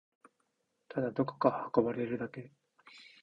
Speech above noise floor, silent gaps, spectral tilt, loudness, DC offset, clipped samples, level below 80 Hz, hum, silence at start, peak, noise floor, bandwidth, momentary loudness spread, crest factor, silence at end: 47 dB; none; -9 dB/octave; -34 LUFS; under 0.1%; under 0.1%; -72 dBFS; none; 0.9 s; -12 dBFS; -80 dBFS; 7.6 kHz; 19 LU; 24 dB; 0.2 s